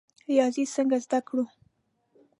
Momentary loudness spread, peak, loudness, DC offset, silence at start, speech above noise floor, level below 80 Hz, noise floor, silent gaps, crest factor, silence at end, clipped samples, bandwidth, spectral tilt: 7 LU; -10 dBFS; -27 LUFS; under 0.1%; 0.3 s; 45 dB; -80 dBFS; -70 dBFS; none; 18 dB; 0.95 s; under 0.1%; 11 kHz; -4 dB/octave